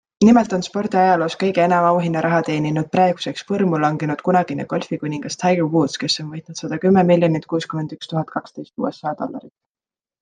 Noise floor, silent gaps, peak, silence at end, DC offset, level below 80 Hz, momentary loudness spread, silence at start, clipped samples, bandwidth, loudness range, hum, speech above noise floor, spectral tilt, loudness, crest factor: under -90 dBFS; none; -2 dBFS; 0.75 s; under 0.1%; -60 dBFS; 12 LU; 0.2 s; under 0.1%; 9.6 kHz; 3 LU; none; over 72 dB; -6 dB/octave; -19 LUFS; 16 dB